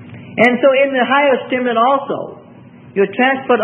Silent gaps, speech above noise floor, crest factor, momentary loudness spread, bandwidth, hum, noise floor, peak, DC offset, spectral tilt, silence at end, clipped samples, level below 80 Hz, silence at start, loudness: none; 26 dB; 14 dB; 13 LU; 6.6 kHz; none; -39 dBFS; 0 dBFS; under 0.1%; -6.5 dB/octave; 0 s; under 0.1%; -66 dBFS; 0 s; -14 LUFS